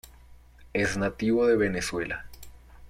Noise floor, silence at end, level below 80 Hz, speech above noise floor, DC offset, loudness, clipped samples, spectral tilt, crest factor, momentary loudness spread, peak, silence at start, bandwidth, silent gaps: -51 dBFS; 0 s; -50 dBFS; 26 dB; under 0.1%; -27 LUFS; under 0.1%; -5 dB/octave; 16 dB; 12 LU; -12 dBFS; 0.3 s; 16 kHz; none